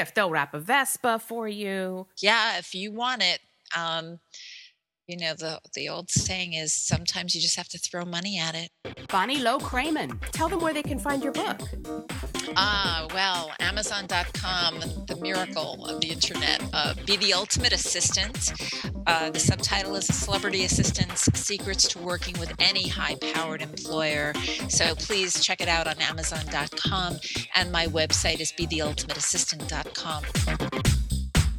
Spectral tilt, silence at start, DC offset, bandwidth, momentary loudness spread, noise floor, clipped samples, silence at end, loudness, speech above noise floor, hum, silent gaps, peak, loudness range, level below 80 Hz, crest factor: -2.5 dB/octave; 0 s; under 0.1%; 18 kHz; 10 LU; -55 dBFS; under 0.1%; 0 s; -26 LUFS; 27 dB; none; none; -4 dBFS; 4 LU; -40 dBFS; 24 dB